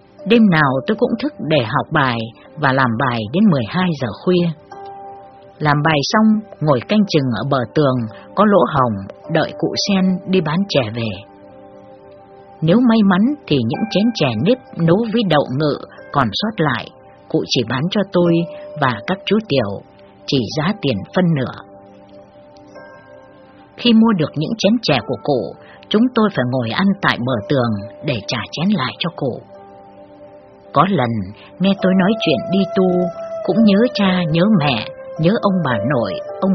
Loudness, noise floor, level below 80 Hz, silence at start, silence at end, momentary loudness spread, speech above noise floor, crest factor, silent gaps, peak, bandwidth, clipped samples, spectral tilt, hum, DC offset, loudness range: -17 LUFS; -43 dBFS; -52 dBFS; 0.2 s; 0 s; 10 LU; 27 dB; 18 dB; none; 0 dBFS; 6.4 kHz; under 0.1%; -5 dB/octave; none; under 0.1%; 5 LU